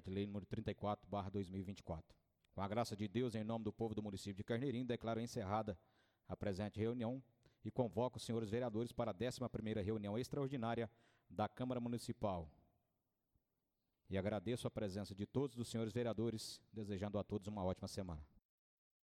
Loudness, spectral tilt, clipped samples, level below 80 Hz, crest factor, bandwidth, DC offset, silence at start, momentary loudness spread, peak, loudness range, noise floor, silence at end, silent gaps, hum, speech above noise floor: -45 LUFS; -6.5 dB/octave; under 0.1%; -68 dBFS; 20 dB; 15.5 kHz; under 0.1%; 0.05 s; 7 LU; -26 dBFS; 3 LU; -89 dBFS; 0.8 s; none; none; 46 dB